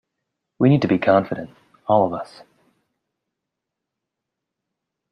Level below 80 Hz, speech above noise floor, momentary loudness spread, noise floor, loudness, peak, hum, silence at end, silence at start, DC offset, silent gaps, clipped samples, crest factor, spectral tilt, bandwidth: -62 dBFS; 64 dB; 18 LU; -83 dBFS; -19 LUFS; -2 dBFS; none; 2.85 s; 0.6 s; under 0.1%; none; under 0.1%; 20 dB; -9 dB/octave; 8.8 kHz